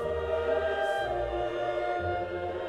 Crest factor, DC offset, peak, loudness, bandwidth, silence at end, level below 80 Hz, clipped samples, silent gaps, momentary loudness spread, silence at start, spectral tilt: 12 dB; under 0.1%; -18 dBFS; -30 LUFS; 12 kHz; 0 s; -48 dBFS; under 0.1%; none; 4 LU; 0 s; -6 dB/octave